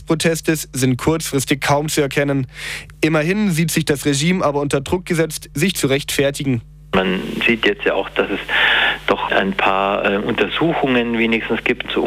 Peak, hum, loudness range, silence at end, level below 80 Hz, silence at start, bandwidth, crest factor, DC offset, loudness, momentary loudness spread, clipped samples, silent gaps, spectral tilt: -2 dBFS; none; 2 LU; 0 s; -42 dBFS; 0 s; 16.5 kHz; 16 dB; under 0.1%; -18 LUFS; 5 LU; under 0.1%; none; -4.5 dB/octave